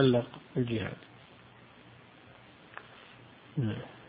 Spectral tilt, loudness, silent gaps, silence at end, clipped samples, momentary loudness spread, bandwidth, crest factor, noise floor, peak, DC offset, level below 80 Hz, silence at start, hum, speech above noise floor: -10.5 dB/octave; -34 LUFS; none; 0.05 s; under 0.1%; 22 LU; 5 kHz; 22 dB; -56 dBFS; -12 dBFS; under 0.1%; -64 dBFS; 0 s; none; 25 dB